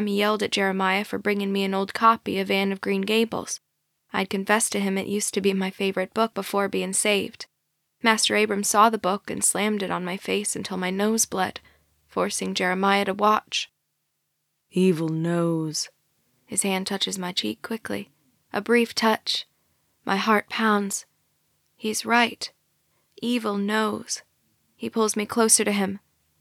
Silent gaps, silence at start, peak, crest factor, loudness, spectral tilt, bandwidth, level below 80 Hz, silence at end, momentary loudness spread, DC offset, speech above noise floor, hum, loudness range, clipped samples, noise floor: none; 0 s; -4 dBFS; 20 dB; -24 LUFS; -3.5 dB/octave; 16.5 kHz; -70 dBFS; 0.45 s; 12 LU; under 0.1%; 52 dB; none; 4 LU; under 0.1%; -76 dBFS